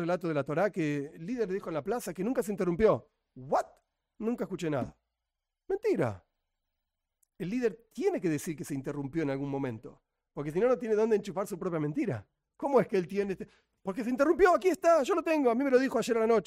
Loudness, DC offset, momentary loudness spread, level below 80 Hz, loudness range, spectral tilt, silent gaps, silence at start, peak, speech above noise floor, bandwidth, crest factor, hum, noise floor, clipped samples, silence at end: -30 LUFS; under 0.1%; 12 LU; -62 dBFS; 8 LU; -6.5 dB/octave; none; 0 s; -12 dBFS; 58 dB; 16 kHz; 18 dB; none; -88 dBFS; under 0.1%; 0.05 s